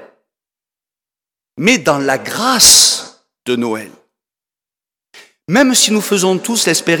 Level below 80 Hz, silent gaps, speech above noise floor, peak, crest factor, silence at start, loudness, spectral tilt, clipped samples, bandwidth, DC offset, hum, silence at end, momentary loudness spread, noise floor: -50 dBFS; none; 77 dB; 0 dBFS; 16 dB; 0 s; -11 LUFS; -2 dB/octave; 0.1%; over 20 kHz; under 0.1%; none; 0 s; 15 LU; -89 dBFS